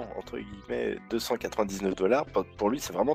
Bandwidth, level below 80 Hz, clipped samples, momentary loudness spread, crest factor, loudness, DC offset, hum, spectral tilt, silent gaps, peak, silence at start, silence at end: 16 kHz; -54 dBFS; under 0.1%; 12 LU; 18 dB; -30 LUFS; under 0.1%; none; -5 dB/octave; none; -12 dBFS; 0 s; 0 s